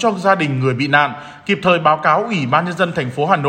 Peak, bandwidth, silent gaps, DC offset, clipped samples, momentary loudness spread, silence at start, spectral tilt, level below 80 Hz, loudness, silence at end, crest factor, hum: 0 dBFS; 9.6 kHz; none; under 0.1%; under 0.1%; 6 LU; 0 s; -6 dB/octave; -58 dBFS; -16 LUFS; 0 s; 16 dB; none